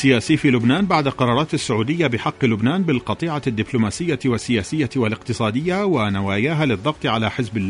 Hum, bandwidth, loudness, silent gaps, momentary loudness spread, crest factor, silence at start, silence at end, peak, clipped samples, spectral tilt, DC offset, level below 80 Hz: none; 11 kHz; -20 LUFS; none; 6 LU; 16 dB; 0 s; 0 s; -2 dBFS; under 0.1%; -6 dB/octave; under 0.1%; -48 dBFS